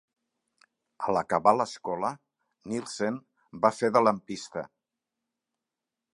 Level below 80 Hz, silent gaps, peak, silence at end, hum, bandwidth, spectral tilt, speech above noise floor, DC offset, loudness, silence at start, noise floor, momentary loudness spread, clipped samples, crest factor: -70 dBFS; none; -4 dBFS; 1.5 s; none; 11.5 kHz; -5 dB/octave; 61 dB; under 0.1%; -28 LUFS; 1 s; -88 dBFS; 15 LU; under 0.1%; 26 dB